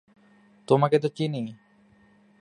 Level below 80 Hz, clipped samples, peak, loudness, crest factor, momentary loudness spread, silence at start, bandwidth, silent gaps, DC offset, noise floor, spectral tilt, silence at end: -72 dBFS; under 0.1%; -6 dBFS; -24 LUFS; 22 dB; 13 LU; 0.7 s; 10.5 kHz; none; under 0.1%; -59 dBFS; -7.5 dB/octave; 0.85 s